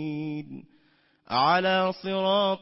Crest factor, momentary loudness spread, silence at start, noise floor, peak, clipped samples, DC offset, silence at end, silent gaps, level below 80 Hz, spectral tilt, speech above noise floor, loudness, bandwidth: 16 dB; 17 LU; 0 s; -65 dBFS; -10 dBFS; under 0.1%; under 0.1%; 0.05 s; none; -70 dBFS; -8.5 dB/octave; 40 dB; -25 LUFS; 5.8 kHz